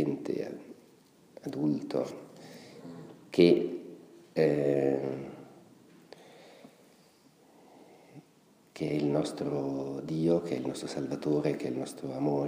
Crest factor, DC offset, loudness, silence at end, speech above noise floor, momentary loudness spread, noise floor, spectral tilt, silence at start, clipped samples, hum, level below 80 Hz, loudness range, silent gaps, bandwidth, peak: 24 dB; under 0.1%; -31 LUFS; 0 s; 33 dB; 22 LU; -62 dBFS; -7 dB/octave; 0 s; under 0.1%; none; -70 dBFS; 8 LU; none; 15.5 kHz; -10 dBFS